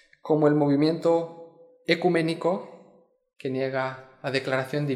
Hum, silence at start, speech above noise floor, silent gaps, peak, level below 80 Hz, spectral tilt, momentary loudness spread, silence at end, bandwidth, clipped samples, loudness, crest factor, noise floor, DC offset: none; 0.25 s; 34 dB; none; -6 dBFS; -76 dBFS; -7 dB/octave; 14 LU; 0 s; 12.5 kHz; under 0.1%; -25 LUFS; 20 dB; -59 dBFS; under 0.1%